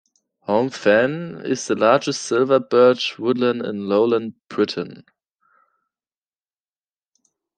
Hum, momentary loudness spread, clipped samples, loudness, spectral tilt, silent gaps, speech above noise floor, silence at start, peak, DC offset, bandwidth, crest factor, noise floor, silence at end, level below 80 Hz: none; 11 LU; under 0.1%; -19 LUFS; -4.5 dB/octave; none; over 71 dB; 0.5 s; -2 dBFS; under 0.1%; 9.2 kHz; 20 dB; under -90 dBFS; 2.55 s; -68 dBFS